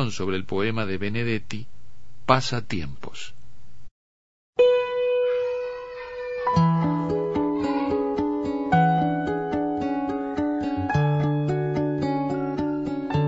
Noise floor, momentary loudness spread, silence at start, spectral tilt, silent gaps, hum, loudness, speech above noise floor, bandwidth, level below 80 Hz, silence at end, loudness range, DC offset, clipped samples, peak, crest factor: -53 dBFS; 12 LU; 0 s; -7 dB/octave; 3.91-4.53 s; none; -24 LUFS; 28 dB; 8 kHz; -50 dBFS; 0 s; 4 LU; under 0.1%; under 0.1%; -2 dBFS; 22 dB